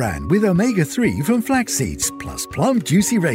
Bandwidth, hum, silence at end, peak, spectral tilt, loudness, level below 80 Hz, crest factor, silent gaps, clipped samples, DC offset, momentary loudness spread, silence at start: 16.5 kHz; none; 0 s; -4 dBFS; -5 dB/octave; -18 LUFS; -40 dBFS; 14 dB; none; under 0.1%; under 0.1%; 6 LU; 0 s